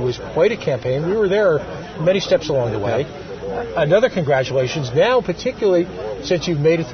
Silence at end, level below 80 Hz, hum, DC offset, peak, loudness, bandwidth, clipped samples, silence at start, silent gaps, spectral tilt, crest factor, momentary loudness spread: 0 s; -44 dBFS; none; under 0.1%; -4 dBFS; -19 LUFS; 6.6 kHz; under 0.1%; 0 s; none; -6 dB/octave; 14 dB; 9 LU